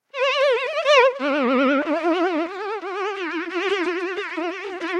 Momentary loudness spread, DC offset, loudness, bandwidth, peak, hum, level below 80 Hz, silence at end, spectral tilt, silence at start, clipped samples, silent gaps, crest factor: 11 LU; under 0.1%; -21 LUFS; 10.5 kHz; -4 dBFS; none; -76 dBFS; 0 s; -2.5 dB/octave; 0.15 s; under 0.1%; none; 16 dB